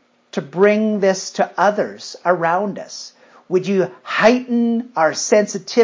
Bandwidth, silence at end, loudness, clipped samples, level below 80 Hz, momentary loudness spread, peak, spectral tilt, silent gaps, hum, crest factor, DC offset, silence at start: 7.6 kHz; 0 s; -18 LUFS; under 0.1%; -68 dBFS; 13 LU; 0 dBFS; -4.5 dB/octave; none; none; 16 dB; under 0.1%; 0.35 s